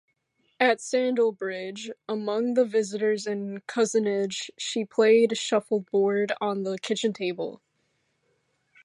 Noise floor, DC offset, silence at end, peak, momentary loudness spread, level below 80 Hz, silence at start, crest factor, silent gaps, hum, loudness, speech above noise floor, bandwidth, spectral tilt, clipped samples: -73 dBFS; under 0.1%; 1.3 s; -8 dBFS; 11 LU; -82 dBFS; 0.6 s; 18 dB; none; none; -26 LUFS; 47 dB; 11.5 kHz; -4 dB/octave; under 0.1%